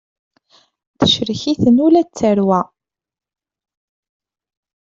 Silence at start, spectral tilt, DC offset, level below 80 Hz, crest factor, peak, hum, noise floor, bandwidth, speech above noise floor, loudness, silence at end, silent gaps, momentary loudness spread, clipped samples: 1 s; -6 dB/octave; under 0.1%; -52 dBFS; 16 dB; -2 dBFS; none; -55 dBFS; 7.6 kHz; 41 dB; -15 LUFS; 2.3 s; none; 7 LU; under 0.1%